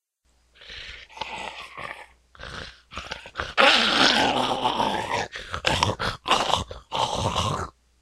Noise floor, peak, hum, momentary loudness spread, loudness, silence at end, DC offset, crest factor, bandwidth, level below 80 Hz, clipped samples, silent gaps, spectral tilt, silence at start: -66 dBFS; 0 dBFS; none; 21 LU; -23 LUFS; 0.3 s; under 0.1%; 26 dB; 15 kHz; -46 dBFS; under 0.1%; none; -3 dB/octave; 0.6 s